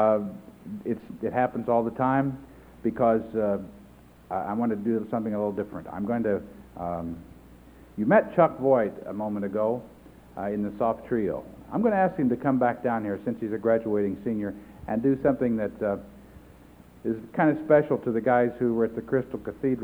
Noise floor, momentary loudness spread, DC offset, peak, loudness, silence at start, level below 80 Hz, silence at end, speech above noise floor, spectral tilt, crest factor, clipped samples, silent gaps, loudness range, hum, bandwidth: -51 dBFS; 13 LU; under 0.1%; -6 dBFS; -27 LUFS; 0 s; -56 dBFS; 0 s; 26 dB; -9.5 dB/octave; 20 dB; under 0.1%; none; 4 LU; none; over 20 kHz